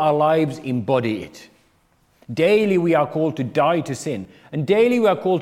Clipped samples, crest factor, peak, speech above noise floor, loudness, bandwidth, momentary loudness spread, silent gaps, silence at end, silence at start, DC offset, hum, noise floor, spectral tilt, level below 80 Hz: under 0.1%; 16 dB; -4 dBFS; 41 dB; -19 LUFS; 15 kHz; 13 LU; none; 0 s; 0 s; under 0.1%; none; -60 dBFS; -6.5 dB/octave; -64 dBFS